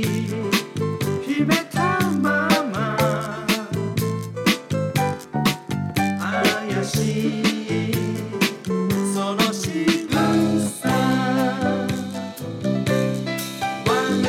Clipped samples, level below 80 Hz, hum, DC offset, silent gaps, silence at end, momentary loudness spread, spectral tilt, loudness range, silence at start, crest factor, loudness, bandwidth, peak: under 0.1%; -52 dBFS; none; under 0.1%; none; 0 s; 6 LU; -5 dB/octave; 2 LU; 0 s; 16 dB; -22 LUFS; 18 kHz; -6 dBFS